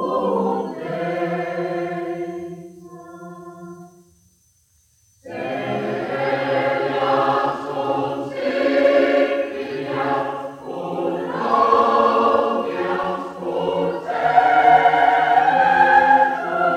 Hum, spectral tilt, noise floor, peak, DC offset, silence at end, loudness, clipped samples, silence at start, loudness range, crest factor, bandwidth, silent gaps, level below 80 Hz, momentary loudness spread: none; -6 dB/octave; -60 dBFS; 0 dBFS; under 0.1%; 0 s; -19 LUFS; under 0.1%; 0 s; 15 LU; 18 dB; 11.5 kHz; none; -60 dBFS; 17 LU